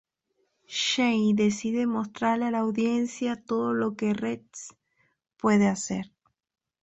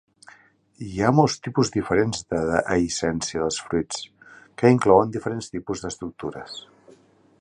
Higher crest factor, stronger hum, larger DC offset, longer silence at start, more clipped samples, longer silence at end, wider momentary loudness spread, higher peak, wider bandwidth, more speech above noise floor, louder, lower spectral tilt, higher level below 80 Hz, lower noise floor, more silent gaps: about the same, 18 dB vs 22 dB; neither; neither; about the same, 0.7 s vs 0.8 s; neither; about the same, 0.8 s vs 0.8 s; second, 12 LU vs 16 LU; second, -10 dBFS vs -2 dBFS; second, 8.2 kHz vs 11 kHz; first, 49 dB vs 33 dB; second, -26 LUFS vs -23 LUFS; about the same, -4.5 dB/octave vs -5.5 dB/octave; second, -66 dBFS vs -50 dBFS; first, -75 dBFS vs -55 dBFS; neither